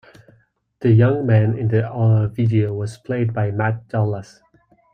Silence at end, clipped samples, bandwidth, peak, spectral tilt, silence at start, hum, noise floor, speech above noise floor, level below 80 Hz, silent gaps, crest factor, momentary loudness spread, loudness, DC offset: 0.7 s; under 0.1%; 8.6 kHz; -4 dBFS; -9.5 dB/octave; 0.8 s; none; -58 dBFS; 41 dB; -54 dBFS; none; 16 dB; 9 LU; -19 LUFS; under 0.1%